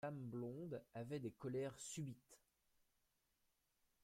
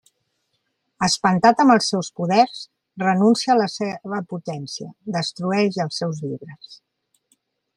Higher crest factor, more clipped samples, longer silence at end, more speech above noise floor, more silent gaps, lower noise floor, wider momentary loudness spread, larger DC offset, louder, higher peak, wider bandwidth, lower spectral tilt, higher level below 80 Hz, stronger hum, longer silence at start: about the same, 16 dB vs 20 dB; neither; first, 1.65 s vs 1 s; second, 36 dB vs 53 dB; neither; first, -85 dBFS vs -73 dBFS; second, 5 LU vs 16 LU; neither; second, -50 LUFS vs -20 LUFS; second, -36 dBFS vs -2 dBFS; first, 16.5 kHz vs 12 kHz; about the same, -6 dB/octave vs -5 dB/octave; second, -82 dBFS vs -62 dBFS; neither; second, 0 s vs 1 s